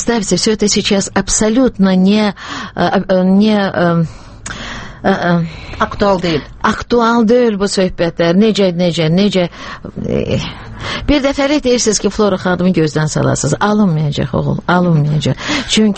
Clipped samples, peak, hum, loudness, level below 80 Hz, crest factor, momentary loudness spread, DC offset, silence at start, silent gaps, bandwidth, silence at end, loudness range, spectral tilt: under 0.1%; 0 dBFS; none; -13 LUFS; -34 dBFS; 14 dB; 10 LU; under 0.1%; 0 s; none; 8.8 kHz; 0 s; 3 LU; -5 dB/octave